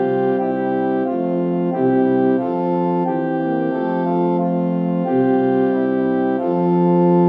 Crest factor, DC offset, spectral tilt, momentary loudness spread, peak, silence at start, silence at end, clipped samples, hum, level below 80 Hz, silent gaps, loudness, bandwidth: 12 dB; under 0.1%; -11.5 dB/octave; 4 LU; -6 dBFS; 0 s; 0 s; under 0.1%; none; -68 dBFS; none; -18 LUFS; 4.6 kHz